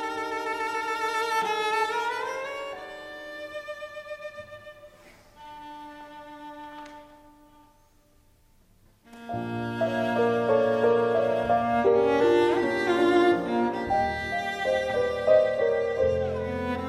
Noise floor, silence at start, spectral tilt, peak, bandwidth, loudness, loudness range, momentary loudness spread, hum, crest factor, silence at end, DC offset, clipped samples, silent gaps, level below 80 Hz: -60 dBFS; 0 s; -5.5 dB/octave; -8 dBFS; 13.5 kHz; -25 LUFS; 22 LU; 21 LU; none; 18 dB; 0 s; under 0.1%; under 0.1%; none; -54 dBFS